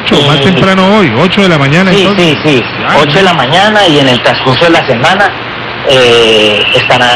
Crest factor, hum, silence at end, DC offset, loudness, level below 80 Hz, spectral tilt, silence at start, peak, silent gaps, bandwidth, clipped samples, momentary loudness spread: 6 dB; none; 0 s; under 0.1%; -6 LUFS; -36 dBFS; -5 dB/octave; 0 s; 0 dBFS; none; 13 kHz; 2%; 4 LU